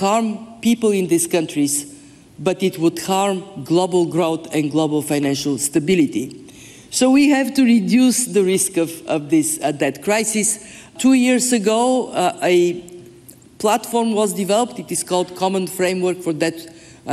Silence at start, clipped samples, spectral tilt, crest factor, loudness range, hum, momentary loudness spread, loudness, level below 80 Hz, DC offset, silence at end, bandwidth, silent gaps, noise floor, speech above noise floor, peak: 0 s; under 0.1%; -4 dB/octave; 12 dB; 4 LU; none; 8 LU; -18 LUFS; -60 dBFS; under 0.1%; 0 s; 15 kHz; none; -44 dBFS; 27 dB; -6 dBFS